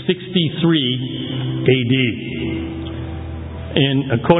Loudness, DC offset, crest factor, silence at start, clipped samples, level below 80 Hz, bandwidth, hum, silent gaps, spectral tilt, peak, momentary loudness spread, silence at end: -19 LUFS; under 0.1%; 18 dB; 0 s; under 0.1%; -36 dBFS; 4 kHz; none; none; -10.5 dB/octave; 0 dBFS; 12 LU; 0 s